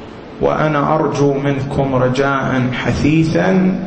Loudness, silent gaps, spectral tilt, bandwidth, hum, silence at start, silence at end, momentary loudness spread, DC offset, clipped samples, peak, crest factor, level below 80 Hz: -15 LUFS; none; -7 dB/octave; 8.6 kHz; none; 0 s; 0 s; 4 LU; under 0.1%; under 0.1%; -2 dBFS; 14 dB; -38 dBFS